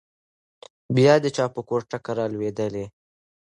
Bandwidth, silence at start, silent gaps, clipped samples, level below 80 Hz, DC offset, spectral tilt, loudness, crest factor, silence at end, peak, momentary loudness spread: 11 kHz; 0.9 s; none; under 0.1%; -62 dBFS; under 0.1%; -6.5 dB/octave; -23 LUFS; 20 dB; 0.55 s; -4 dBFS; 12 LU